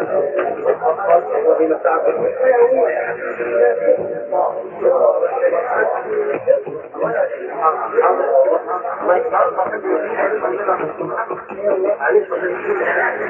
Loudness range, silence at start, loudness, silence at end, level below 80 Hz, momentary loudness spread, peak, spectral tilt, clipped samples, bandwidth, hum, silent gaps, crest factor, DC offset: 3 LU; 0 s; -17 LUFS; 0 s; -66 dBFS; 7 LU; 0 dBFS; -9 dB/octave; under 0.1%; 3.2 kHz; none; none; 16 dB; under 0.1%